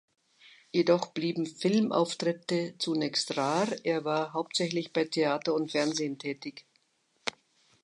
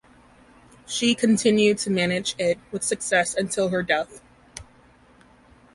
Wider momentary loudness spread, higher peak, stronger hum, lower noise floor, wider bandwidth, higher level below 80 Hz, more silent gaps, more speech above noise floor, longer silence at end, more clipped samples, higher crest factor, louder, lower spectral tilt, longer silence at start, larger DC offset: second, 10 LU vs 18 LU; second, -12 dBFS vs -6 dBFS; neither; first, -72 dBFS vs -54 dBFS; about the same, 11.5 kHz vs 11.5 kHz; second, -82 dBFS vs -58 dBFS; neither; first, 43 dB vs 32 dB; second, 0.55 s vs 1.1 s; neither; about the same, 20 dB vs 18 dB; second, -30 LUFS vs -22 LUFS; about the same, -4.5 dB/octave vs -3.5 dB/octave; second, 0.75 s vs 0.9 s; neither